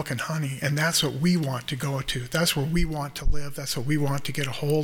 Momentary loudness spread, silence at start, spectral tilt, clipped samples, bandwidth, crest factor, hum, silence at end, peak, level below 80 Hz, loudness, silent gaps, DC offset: 8 LU; 0 s; -4.5 dB/octave; under 0.1%; 18.5 kHz; 16 dB; none; 0 s; -8 dBFS; -34 dBFS; -26 LUFS; none; under 0.1%